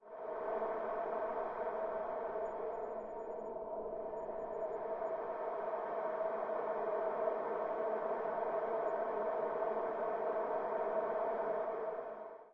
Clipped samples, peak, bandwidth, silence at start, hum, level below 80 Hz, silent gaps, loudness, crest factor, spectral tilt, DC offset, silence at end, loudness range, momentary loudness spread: under 0.1%; -24 dBFS; 4.4 kHz; 0 s; none; -72 dBFS; none; -39 LUFS; 16 dB; -4.5 dB/octave; under 0.1%; 0 s; 4 LU; 6 LU